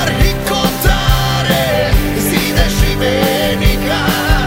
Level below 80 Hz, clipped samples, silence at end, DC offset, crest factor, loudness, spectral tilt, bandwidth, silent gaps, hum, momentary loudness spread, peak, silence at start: -18 dBFS; under 0.1%; 0 s; under 0.1%; 12 dB; -13 LUFS; -4.5 dB/octave; 16.5 kHz; none; none; 1 LU; 0 dBFS; 0 s